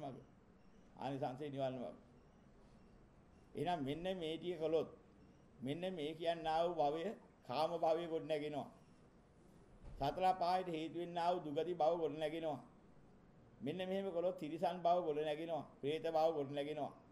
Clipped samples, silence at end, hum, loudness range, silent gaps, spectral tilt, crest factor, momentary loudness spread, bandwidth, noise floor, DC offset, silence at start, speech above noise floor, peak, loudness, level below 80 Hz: under 0.1%; 0 s; none; 6 LU; none; -6.5 dB/octave; 18 dB; 12 LU; 14.5 kHz; -66 dBFS; under 0.1%; 0 s; 26 dB; -24 dBFS; -41 LUFS; -70 dBFS